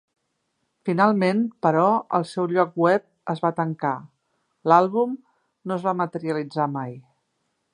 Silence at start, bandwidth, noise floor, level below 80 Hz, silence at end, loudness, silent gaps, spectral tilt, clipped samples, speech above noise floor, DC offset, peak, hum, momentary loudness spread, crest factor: 0.85 s; 10.5 kHz; -74 dBFS; -76 dBFS; 0.75 s; -23 LUFS; none; -7.5 dB/octave; under 0.1%; 53 dB; under 0.1%; -2 dBFS; none; 13 LU; 22 dB